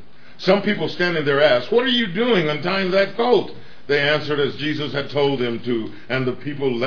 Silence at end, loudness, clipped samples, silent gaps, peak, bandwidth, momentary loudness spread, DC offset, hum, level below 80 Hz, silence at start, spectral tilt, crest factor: 0 s; -20 LUFS; under 0.1%; none; -2 dBFS; 5.4 kHz; 8 LU; 2%; none; -60 dBFS; 0.4 s; -6.5 dB/octave; 18 dB